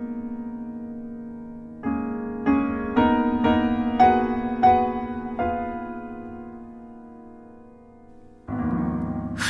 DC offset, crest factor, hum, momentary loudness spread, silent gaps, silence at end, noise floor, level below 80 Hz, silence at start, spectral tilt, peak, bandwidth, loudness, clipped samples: under 0.1%; 18 dB; none; 21 LU; none; 0 s; -47 dBFS; -44 dBFS; 0 s; -6.5 dB/octave; -6 dBFS; 11 kHz; -24 LUFS; under 0.1%